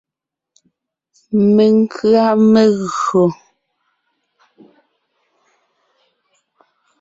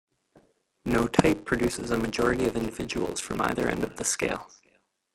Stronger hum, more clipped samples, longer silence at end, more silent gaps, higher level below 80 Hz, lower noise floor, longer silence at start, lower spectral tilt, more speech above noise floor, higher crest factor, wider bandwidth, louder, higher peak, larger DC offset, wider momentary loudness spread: neither; neither; first, 3.65 s vs 0.65 s; neither; second, -60 dBFS vs -48 dBFS; first, -84 dBFS vs -68 dBFS; first, 1.3 s vs 0.85 s; first, -7 dB/octave vs -4.5 dB/octave; first, 72 dB vs 41 dB; second, 14 dB vs 26 dB; second, 7.8 kHz vs 16.5 kHz; first, -13 LUFS vs -27 LUFS; about the same, -2 dBFS vs -2 dBFS; neither; about the same, 7 LU vs 7 LU